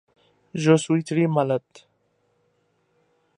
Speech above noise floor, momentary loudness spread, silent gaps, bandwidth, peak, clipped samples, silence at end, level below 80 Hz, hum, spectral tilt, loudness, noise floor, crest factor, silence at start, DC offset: 47 dB; 8 LU; none; 11 kHz; -4 dBFS; under 0.1%; 1.8 s; -72 dBFS; none; -6.5 dB/octave; -22 LUFS; -68 dBFS; 20 dB; 0.55 s; under 0.1%